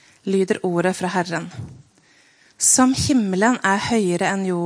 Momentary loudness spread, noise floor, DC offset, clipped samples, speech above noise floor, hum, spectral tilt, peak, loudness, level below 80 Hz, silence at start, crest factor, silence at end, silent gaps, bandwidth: 12 LU; -55 dBFS; under 0.1%; under 0.1%; 36 dB; none; -4 dB/octave; -2 dBFS; -19 LUFS; -52 dBFS; 0.25 s; 18 dB; 0 s; none; 10.5 kHz